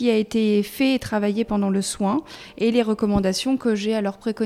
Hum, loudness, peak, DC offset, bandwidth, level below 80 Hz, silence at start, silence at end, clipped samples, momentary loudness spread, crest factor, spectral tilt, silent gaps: none; -22 LUFS; -6 dBFS; under 0.1%; 15.5 kHz; -46 dBFS; 0 s; 0 s; under 0.1%; 4 LU; 16 dB; -5.5 dB/octave; none